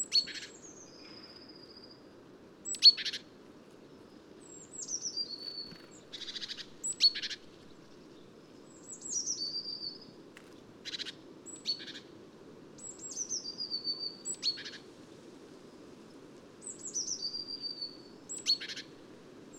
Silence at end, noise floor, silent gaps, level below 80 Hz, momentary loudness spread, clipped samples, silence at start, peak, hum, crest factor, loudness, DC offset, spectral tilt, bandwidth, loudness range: 0 s; -55 dBFS; none; -76 dBFS; 24 LU; under 0.1%; 0 s; -10 dBFS; none; 28 dB; -32 LUFS; under 0.1%; 0.5 dB/octave; 16 kHz; 11 LU